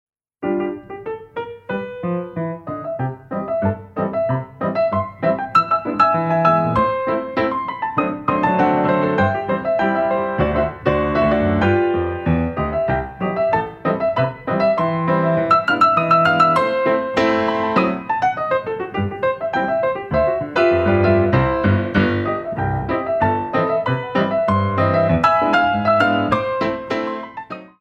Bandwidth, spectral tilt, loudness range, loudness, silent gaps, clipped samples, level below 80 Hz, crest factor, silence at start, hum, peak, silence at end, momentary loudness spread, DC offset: 8.4 kHz; -8 dB/octave; 6 LU; -18 LUFS; none; under 0.1%; -40 dBFS; 16 dB; 0.4 s; none; -2 dBFS; 0.15 s; 10 LU; under 0.1%